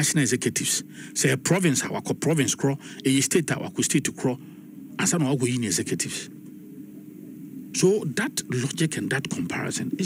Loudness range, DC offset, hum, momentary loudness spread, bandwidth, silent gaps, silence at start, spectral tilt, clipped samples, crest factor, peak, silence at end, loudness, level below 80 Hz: 4 LU; under 0.1%; none; 20 LU; 16 kHz; none; 0 s; -4 dB/octave; under 0.1%; 18 dB; -8 dBFS; 0 s; -24 LUFS; -64 dBFS